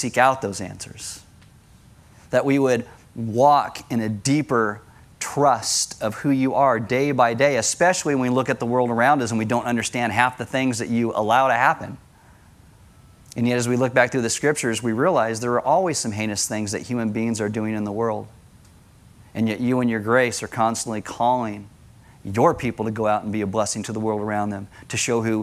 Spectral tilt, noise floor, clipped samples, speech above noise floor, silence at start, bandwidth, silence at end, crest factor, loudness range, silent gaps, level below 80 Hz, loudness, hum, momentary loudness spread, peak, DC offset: -4.5 dB/octave; -50 dBFS; under 0.1%; 29 dB; 0 s; 15.5 kHz; 0 s; 20 dB; 4 LU; none; -56 dBFS; -21 LUFS; none; 10 LU; -2 dBFS; under 0.1%